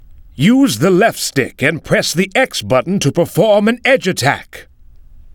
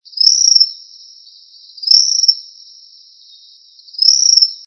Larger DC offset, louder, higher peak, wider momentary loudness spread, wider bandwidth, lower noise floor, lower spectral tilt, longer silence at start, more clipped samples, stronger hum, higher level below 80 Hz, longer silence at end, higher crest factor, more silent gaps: neither; second, -14 LUFS vs -9 LUFS; about the same, 0 dBFS vs 0 dBFS; second, 5 LU vs 14 LU; first, 20 kHz vs 8 kHz; second, -39 dBFS vs -44 dBFS; first, -4.5 dB/octave vs 10 dB/octave; about the same, 0.1 s vs 0.15 s; second, under 0.1% vs 0.3%; neither; first, -44 dBFS vs under -90 dBFS; about the same, 0.05 s vs 0.1 s; about the same, 14 dB vs 16 dB; neither